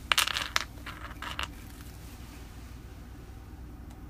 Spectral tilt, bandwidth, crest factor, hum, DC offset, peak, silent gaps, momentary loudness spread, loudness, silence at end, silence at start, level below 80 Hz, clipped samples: -1.5 dB/octave; 15.5 kHz; 34 dB; none; under 0.1%; -2 dBFS; none; 20 LU; -32 LUFS; 0 s; 0 s; -46 dBFS; under 0.1%